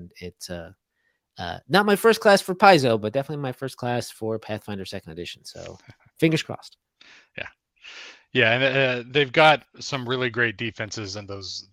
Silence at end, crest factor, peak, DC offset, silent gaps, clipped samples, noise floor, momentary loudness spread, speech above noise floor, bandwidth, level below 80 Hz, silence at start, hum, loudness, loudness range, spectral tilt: 0.1 s; 24 dB; 0 dBFS; under 0.1%; none; under 0.1%; -73 dBFS; 22 LU; 50 dB; 16.5 kHz; -62 dBFS; 0 s; none; -22 LUFS; 10 LU; -4.5 dB/octave